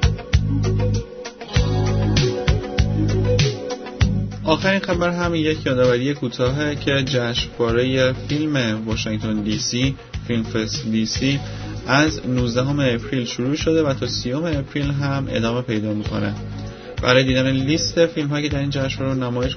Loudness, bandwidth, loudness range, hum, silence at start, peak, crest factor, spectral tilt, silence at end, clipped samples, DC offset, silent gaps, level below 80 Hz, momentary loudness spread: -20 LUFS; 6.6 kHz; 2 LU; none; 0 s; -2 dBFS; 18 dB; -5.5 dB/octave; 0 s; under 0.1%; under 0.1%; none; -32 dBFS; 6 LU